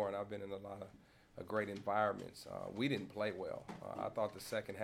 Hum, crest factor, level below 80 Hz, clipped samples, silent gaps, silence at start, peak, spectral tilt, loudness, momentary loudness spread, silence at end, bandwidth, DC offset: none; 20 dB; -74 dBFS; under 0.1%; none; 0 s; -22 dBFS; -5.5 dB/octave; -42 LUFS; 13 LU; 0 s; 17 kHz; under 0.1%